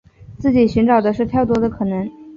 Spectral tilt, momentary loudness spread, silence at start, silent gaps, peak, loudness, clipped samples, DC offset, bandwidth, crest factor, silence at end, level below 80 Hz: -8.5 dB/octave; 8 LU; 0.2 s; none; -4 dBFS; -17 LUFS; under 0.1%; under 0.1%; 7 kHz; 14 dB; 0 s; -40 dBFS